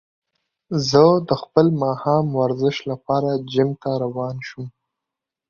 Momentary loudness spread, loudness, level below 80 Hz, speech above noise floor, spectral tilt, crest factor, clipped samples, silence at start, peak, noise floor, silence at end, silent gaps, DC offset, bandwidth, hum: 14 LU; -20 LUFS; -58 dBFS; 66 dB; -6.5 dB/octave; 20 dB; under 0.1%; 0.7 s; -2 dBFS; -85 dBFS; 0.8 s; none; under 0.1%; 7.4 kHz; none